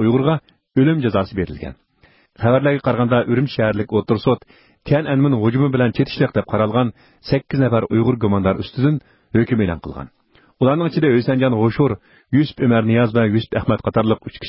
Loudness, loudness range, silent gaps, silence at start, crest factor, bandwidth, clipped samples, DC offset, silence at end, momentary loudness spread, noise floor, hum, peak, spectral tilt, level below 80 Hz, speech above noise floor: -18 LUFS; 2 LU; none; 0 s; 14 dB; 5.8 kHz; under 0.1%; under 0.1%; 0 s; 8 LU; -55 dBFS; none; -4 dBFS; -12.5 dB/octave; -42 dBFS; 38 dB